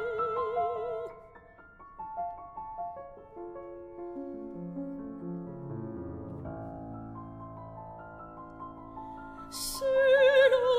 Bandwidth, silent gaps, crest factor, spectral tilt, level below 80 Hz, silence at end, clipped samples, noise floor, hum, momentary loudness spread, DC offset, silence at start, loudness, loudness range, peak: 16 kHz; none; 20 dB; -4.5 dB/octave; -58 dBFS; 0 s; under 0.1%; -54 dBFS; none; 22 LU; under 0.1%; 0 s; -31 LUFS; 13 LU; -12 dBFS